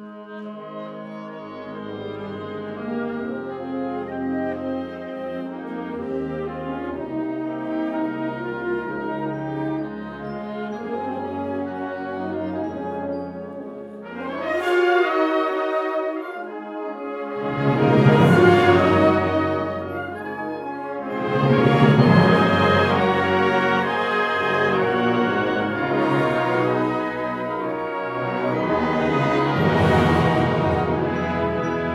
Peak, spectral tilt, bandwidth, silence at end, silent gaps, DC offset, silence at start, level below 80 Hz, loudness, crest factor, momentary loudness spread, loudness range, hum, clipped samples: -2 dBFS; -7.5 dB/octave; 12.5 kHz; 0 s; none; under 0.1%; 0 s; -54 dBFS; -22 LUFS; 20 dB; 16 LU; 11 LU; none; under 0.1%